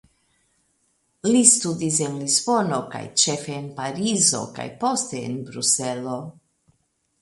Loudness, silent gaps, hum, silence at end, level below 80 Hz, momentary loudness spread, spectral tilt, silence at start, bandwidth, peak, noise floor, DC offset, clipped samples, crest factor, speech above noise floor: -21 LUFS; none; none; 0.9 s; -66 dBFS; 16 LU; -3 dB/octave; 1.25 s; 11.5 kHz; 0 dBFS; -70 dBFS; under 0.1%; under 0.1%; 24 dB; 48 dB